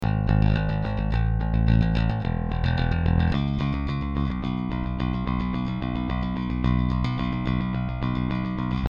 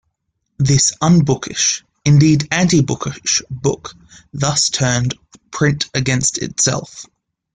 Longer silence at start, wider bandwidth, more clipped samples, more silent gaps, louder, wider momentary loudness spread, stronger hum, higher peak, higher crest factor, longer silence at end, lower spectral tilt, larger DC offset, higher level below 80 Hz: second, 0 s vs 0.6 s; second, 6.8 kHz vs 9.6 kHz; neither; neither; second, -25 LUFS vs -16 LUFS; second, 6 LU vs 14 LU; neither; second, -8 dBFS vs -2 dBFS; about the same, 16 dB vs 14 dB; second, 0.05 s vs 0.5 s; first, -9 dB/octave vs -4 dB/octave; neither; first, -30 dBFS vs -46 dBFS